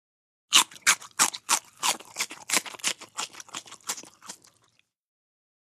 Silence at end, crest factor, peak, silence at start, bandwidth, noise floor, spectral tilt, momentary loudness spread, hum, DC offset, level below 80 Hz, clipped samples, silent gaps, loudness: 1.25 s; 26 dB; -4 dBFS; 0.5 s; 15.5 kHz; -68 dBFS; 2 dB/octave; 19 LU; none; under 0.1%; -80 dBFS; under 0.1%; none; -25 LUFS